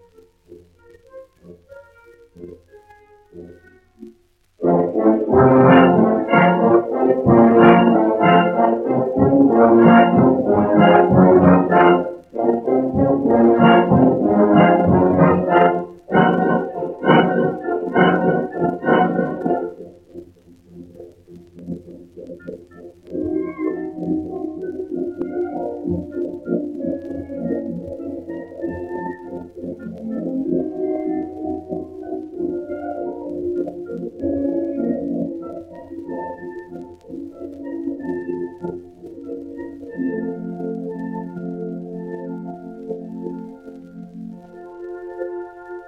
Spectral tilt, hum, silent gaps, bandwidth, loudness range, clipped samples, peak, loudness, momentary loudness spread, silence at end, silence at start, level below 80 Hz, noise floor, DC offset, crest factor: -10 dB/octave; none; none; 3.8 kHz; 17 LU; under 0.1%; -2 dBFS; -17 LUFS; 21 LU; 0 s; 0.5 s; -52 dBFS; -55 dBFS; under 0.1%; 18 dB